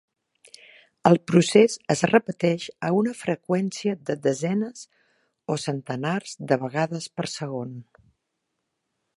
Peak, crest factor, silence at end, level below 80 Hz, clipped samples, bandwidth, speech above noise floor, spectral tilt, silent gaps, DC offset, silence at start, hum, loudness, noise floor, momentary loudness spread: -2 dBFS; 24 dB; 1.35 s; -68 dBFS; under 0.1%; 11.5 kHz; 56 dB; -5.5 dB/octave; none; under 0.1%; 1.05 s; none; -24 LUFS; -79 dBFS; 13 LU